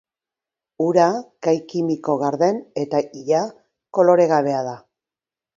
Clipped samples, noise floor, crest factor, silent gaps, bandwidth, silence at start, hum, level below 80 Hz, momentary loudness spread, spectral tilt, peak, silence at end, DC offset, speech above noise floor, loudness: under 0.1%; under -90 dBFS; 20 dB; none; 7.6 kHz; 0.8 s; none; -68 dBFS; 10 LU; -6.5 dB/octave; -2 dBFS; 0.8 s; under 0.1%; over 71 dB; -20 LUFS